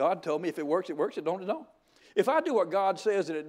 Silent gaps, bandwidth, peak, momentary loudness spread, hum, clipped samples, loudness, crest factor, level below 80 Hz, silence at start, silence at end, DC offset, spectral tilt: none; 16 kHz; -12 dBFS; 7 LU; none; under 0.1%; -29 LUFS; 18 dB; -82 dBFS; 0 s; 0 s; under 0.1%; -5.5 dB/octave